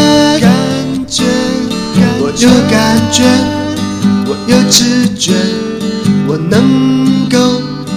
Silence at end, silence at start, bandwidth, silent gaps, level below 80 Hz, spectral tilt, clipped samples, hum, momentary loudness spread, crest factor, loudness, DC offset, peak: 0 s; 0 s; 16.5 kHz; none; -38 dBFS; -4.5 dB/octave; 0.5%; none; 8 LU; 10 dB; -10 LUFS; under 0.1%; 0 dBFS